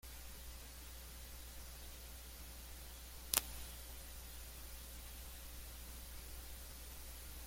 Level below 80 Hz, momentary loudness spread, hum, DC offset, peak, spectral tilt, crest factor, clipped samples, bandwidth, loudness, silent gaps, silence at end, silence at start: -54 dBFS; 9 LU; none; under 0.1%; -6 dBFS; -1.5 dB/octave; 42 dB; under 0.1%; 16.5 kHz; -48 LUFS; none; 0 s; 0.05 s